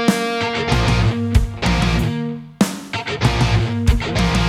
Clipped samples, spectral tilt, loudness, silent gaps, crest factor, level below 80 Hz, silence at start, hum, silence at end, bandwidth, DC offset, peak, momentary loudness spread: under 0.1%; -5.5 dB/octave; -19 LUFS; none; 16 dB; -24 dBFS; 0 s; none; 0 s; 15.5 kHz; under 0.1%; -2 dBFS; 5 LU